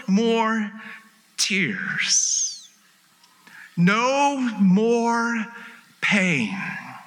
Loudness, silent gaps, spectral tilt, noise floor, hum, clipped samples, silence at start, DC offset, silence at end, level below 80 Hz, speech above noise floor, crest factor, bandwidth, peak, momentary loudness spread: -21 LUFS; none; -3.5 dB/octave; -57 dBFS; none; under 0.1%; 0 s; under 0.1%; 0.05 s; -84 dBFS; 36 dB; 16 dB; 12.5 kHz; -6 dBFS; 16 LU